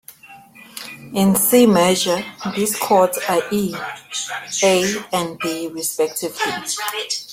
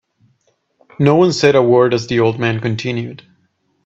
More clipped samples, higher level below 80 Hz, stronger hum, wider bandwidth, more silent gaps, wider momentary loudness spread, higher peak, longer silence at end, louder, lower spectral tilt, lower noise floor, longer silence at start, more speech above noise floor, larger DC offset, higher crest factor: neither; about the same, -58 dBFS vs -54 dBFS; neither; first, 16.5 kHz vs 7.8 kHz; neither; first, 13 LU vs 10 LU; about the same, -2 dBFS vs 0 dBFS; second, 0 s vs 0.7 s; second, -18 LUFS vs -14 LUFS; second, -3.5 dB/octave vs -6.5 dB/octave; second, -44 dBFS vs -62 dBFS; second, 0.1 s vs 1 s; second, 25 dB vs 49 dB; neither; about the same, 18 dB vs 16 dB